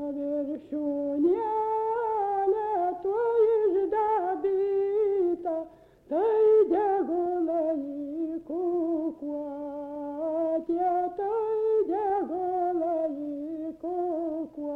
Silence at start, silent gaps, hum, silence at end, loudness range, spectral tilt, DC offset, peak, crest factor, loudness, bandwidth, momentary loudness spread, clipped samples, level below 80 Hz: 0 s; none; none; 0 s; 4 LU; -8 dB/octave; under 0.1%; -14 dBFS; 12 dB; -28 LUFS; 4.2 kHz; 11 LU; under 0.1%; -66 dBFS